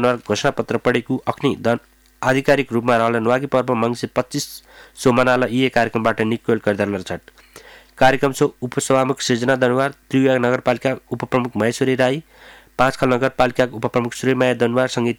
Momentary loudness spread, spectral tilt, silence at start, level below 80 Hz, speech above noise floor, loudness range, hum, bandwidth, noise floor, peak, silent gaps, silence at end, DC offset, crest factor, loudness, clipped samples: 7 LU; -5.5 dB/octave; 0 s; -50 dBFS; 26 dB; 1 LU; none; 17.5 kHz; -44 dBFS; -4 dBFS; none; 0.05 s; under 0.1%; 14 dB; -19 LUFS; under 0.1%